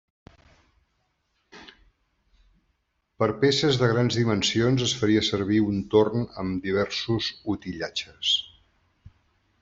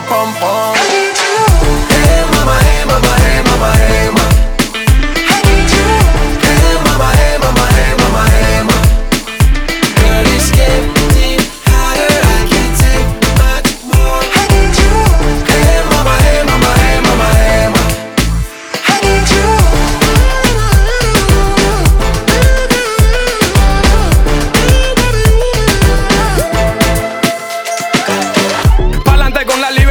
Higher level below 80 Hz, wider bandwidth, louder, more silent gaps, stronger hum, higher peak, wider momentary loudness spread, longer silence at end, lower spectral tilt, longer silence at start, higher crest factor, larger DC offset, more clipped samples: second, -56 dBFS vs -12 dBFS; second, 8.2 kHz vs over 20 kHz; second, -24 LUFS vs -10 LUFS; neither; neither; second, -6 dBFS vs 0 dBFS; first, 9 LU vs 4 LU; first, 1.15 s vs 0 s; about the same, -5 dB/octave vs -4.5 dB/octave; first, 1.55 s vs 0 s; first, 20 dB vs 8 dB; neither; neither